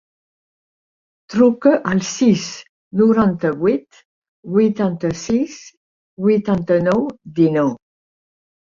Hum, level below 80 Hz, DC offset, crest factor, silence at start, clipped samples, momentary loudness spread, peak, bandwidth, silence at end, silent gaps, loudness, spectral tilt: none; -54 dBFS; under 0.1%; 16 dB; 1.3 s; under 0.1%; 11 LU; -2 dBFS; 7.4 kHz; 0.85 s; 2.69-2.91 s, 4.05-4.22 s, 4.28-4.43 s, 5.77-6.17 s; -17 LUFS; -6.5 dB/octave